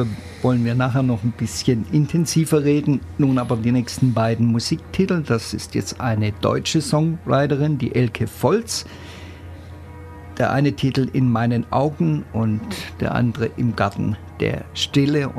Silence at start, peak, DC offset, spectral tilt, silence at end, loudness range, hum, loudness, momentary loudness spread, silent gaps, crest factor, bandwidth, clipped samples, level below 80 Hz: 0 s; -4 dBFS; under 0.1%; -6 dB/octave; 0 s; 3 LU; none; -20 LUFS; 8 LU; none; 16 dB; 14 kHz; under 0.1%; -46 dBFS